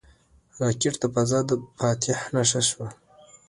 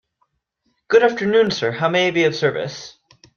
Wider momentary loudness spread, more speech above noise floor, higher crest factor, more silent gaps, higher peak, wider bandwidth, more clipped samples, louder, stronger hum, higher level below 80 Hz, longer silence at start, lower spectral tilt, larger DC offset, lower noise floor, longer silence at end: second, 7 LU vs 14 LU; second, 33 dB vs 52 dB; about the same, 20 dB vs 18 dB; neither; second, -6 dBFS vs -2 dBFS; first, 11.5 kHz vs 7 kHz; neither; second, -24 LUFS vs -18 LUFS; neither; about the same, -58 dBFS vs -62 dBFS; second, 0.55 s vs 0.9 s; about the same, -4 dB/octave vs -5 dB/octave; neither; second, -57 dBFS vs -70 dBFS; about the same, 0.55 s vs 0.45 s